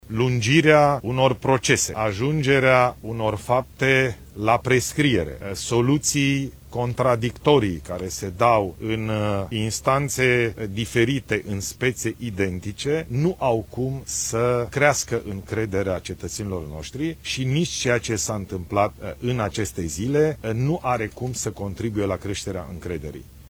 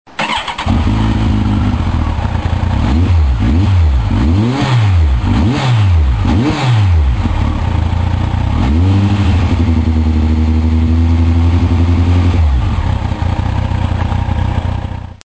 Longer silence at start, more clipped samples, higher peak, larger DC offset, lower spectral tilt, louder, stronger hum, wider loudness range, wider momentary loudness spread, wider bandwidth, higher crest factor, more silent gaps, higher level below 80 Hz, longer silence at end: about the same, 0.1 s vs 0.2 s; neither; about the same, -2 dBFS vs 0 dBFS; second, under 0.1% vs 0.9%; second, -4.5 dB/octave vs -7.5 dB/octave; second, -23 LUFS vs -13 LUFS; neither; first, 5 LU vs 2 LU; first, 10 LU vs 5 LU; first, 19.5 kHz vs 8 kHz; first, 20 dB vs 12 dB; neither; second, -44 dBFS vs -16 dBFS; about the same, 0 s vs 0.1 s